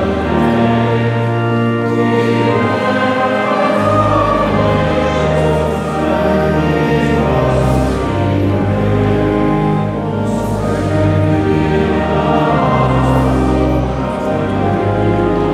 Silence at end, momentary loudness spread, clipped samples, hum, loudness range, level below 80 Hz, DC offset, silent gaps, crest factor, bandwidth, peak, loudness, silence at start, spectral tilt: 0 s; 4 LU; under 0.1%; none; 1 LU; -28 dBFS; under 0.1%; none; 10 dB; 13.5 kHz; -2 dBFS; -14 LUFS; 0 s; -7.5 dB/octave